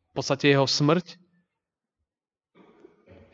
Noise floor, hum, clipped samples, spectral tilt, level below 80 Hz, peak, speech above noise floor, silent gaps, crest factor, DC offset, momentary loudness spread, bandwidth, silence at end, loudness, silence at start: under -90 dBFS; none; under 0.1%; -5 dB/octave; -70 dBFS; -8 dBFS; over 67 dB; none; 20 dB; under 0.1%; 6 LU; 7.8 kHz; 2.2 s; -23 LUFS; 0.15 s